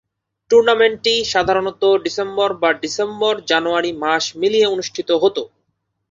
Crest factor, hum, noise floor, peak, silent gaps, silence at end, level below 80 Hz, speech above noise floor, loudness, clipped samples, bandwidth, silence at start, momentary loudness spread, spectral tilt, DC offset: 16 dB; none; -71 dBFS; -2 dBFS; none; 0.65 s; -56 dBFS; 54 dB; -17 LUFS; under 0.1%; 7.8 kHz; 0.5 s; 6 LU; -3 dB/octave; under 0.1%